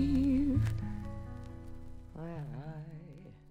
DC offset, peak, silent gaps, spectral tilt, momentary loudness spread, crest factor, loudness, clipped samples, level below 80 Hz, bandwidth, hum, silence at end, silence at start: under 0.1%; -20 dBFS; none; -9 dB/octave; 21 LU; 16 dB; -35 LUFS; under 0.1%; -46 dBFS; 10 kHz; none; 0 s; 0 s